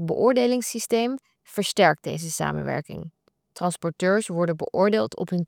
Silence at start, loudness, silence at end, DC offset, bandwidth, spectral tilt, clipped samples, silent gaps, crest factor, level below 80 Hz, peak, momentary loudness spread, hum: 0 s; -24 LUFS; 0 s; under 0.1%; over 20 kHz; -4.5 dB/octave; under 0.1%; none; 20 dB; -62 dBFS; -4 dBFS; 12 LU; none